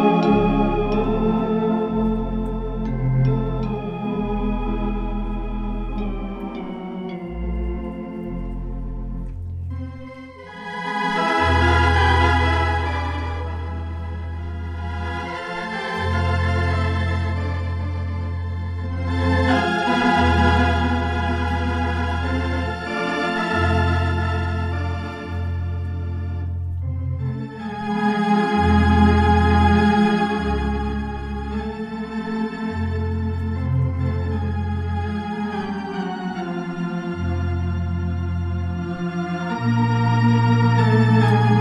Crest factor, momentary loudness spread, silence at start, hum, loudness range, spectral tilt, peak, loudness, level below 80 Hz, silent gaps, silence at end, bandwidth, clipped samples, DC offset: 18 dB; 13 LU; 0 s; none; 9 LU; -7.5 dB/octave; -4 dBFS; -22 LUFS; -32 dBFS; none; 0 s; 10.5 kHz; under 0.1%; under 0.1%